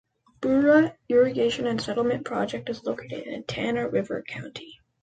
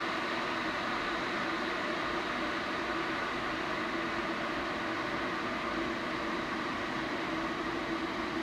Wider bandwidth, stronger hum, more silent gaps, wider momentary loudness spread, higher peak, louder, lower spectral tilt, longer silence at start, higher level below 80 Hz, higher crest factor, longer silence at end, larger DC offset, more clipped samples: second, 9.2 kHz vs 14 kHz; neither; neither; first, 15 LU vs 1 LU; first, -8 dBFS vs -20 dBFS; first, -25 LUFS vs -34 LUFS; first, -6 dB/octave vs -4 dB/octave; first, 0.4 s vs 0 s; about the same, -60 dBFS vs -58 dBFS; about the same, 18 dB vs 14 dB; first, 0.3 s vs 0 s; neither; neither